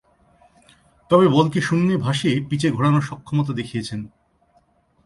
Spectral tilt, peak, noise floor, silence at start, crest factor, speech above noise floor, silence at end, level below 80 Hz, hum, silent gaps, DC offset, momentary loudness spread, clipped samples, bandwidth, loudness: -6.5 dB/octave; -2 dBFS; -61 dBFS; 1.1 s; 18 dB; 42 dB; 1 s; -54 dBFS; none; none; under 0.1%; 12 LU; under 0.1%; 11.5 kHz; -20 LUFS